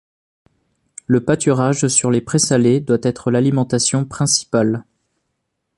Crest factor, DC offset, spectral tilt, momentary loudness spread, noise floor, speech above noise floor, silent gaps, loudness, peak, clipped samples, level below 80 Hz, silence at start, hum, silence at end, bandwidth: 18 dB; under 0.1%; -4.5 dB/octave; 4 LU; -73 dBFS; 57 dB; none; -16 LUFS; 0 dBFS; under 0.1%; -52 dBFS; 1.1 s; none; 0.95 s; 11.5 kHz